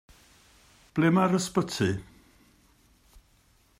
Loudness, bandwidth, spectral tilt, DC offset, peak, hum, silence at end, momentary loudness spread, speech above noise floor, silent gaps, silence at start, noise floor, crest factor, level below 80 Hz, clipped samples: -26 LUFS; 15 kHz; -5.5 dB/octave; under 0.1%; -12 dBFS; none; 1.75 s; 11 LU; 38 dB; none; 0.95 s; -63 dBFS; 18 dB; -60 dBFS; under 0.1%